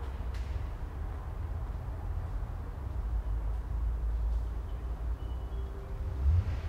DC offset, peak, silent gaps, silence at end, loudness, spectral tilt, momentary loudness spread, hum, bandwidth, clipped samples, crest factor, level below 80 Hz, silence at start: under 0.1%; -18 dBFS; none; 0 s; -37 LUFS; -8 dB/octave; 7 LU; none; 6 kHz; under 0.1%; 16 dB; -34 dBFS; 0 s